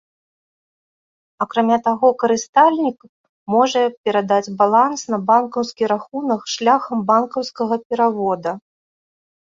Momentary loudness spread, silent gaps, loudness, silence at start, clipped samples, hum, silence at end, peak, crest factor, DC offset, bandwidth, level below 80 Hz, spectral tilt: 9 LU; 2.49-2.53 s, 3.09-3.46 s, 3.98-4.04 s, 7.85-7.90 s; -18 LUFS; 1.4 s; under 0.1%; none; 1 s; -2 dBFS; 18 dB; under 0.1%; 7.6 kHz; -66 dBFS; -4.5 dB/octave